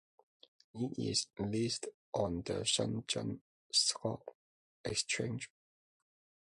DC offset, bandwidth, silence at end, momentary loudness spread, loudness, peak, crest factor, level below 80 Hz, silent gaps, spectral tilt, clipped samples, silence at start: under 0.1%; 11.5 kHz; 1 s; 15 LU; -36 LUFS; -18 dBFS; 20 dB; -64 dBFS; 1.94-2.13 s, 3.41-3.70 s, 4.35-4.84 s; -3 dB/octave; under 0.1%; 0.75 s